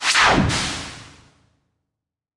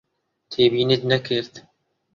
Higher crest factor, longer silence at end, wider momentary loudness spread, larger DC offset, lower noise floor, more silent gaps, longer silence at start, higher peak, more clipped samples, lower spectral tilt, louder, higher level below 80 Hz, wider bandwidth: about the same, 18 dB vs 18 dB; first, 1.3 s vs 0.55 s; first, 21 LU vs 13 LU; neither; first, -84 dBFS vs -46 dBFS; neither; second, 0 s vs 0.5 s; about the same, -4 dBFS vs -4 dBFS; neither; second, -3 dB/octave vs -6.5 dB/octave; about the same, -18 LUFS vs -20 LUFS; first, -40 dBFS vs -60 dBFS; first, 11.5 kHz vs 7.2 kHz